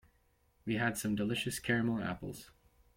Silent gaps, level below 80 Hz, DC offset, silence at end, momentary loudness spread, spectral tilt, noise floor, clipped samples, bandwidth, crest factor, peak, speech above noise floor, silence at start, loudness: none; -62 dBFS; under 0.1%; 0.5 s; 14 LU; -5 dB/octave; -72 dBFS; under 0.1%; 16.5 kHz; 18 dB; -18 dBFS; 37 dB; 0.65 s; -35 LUFS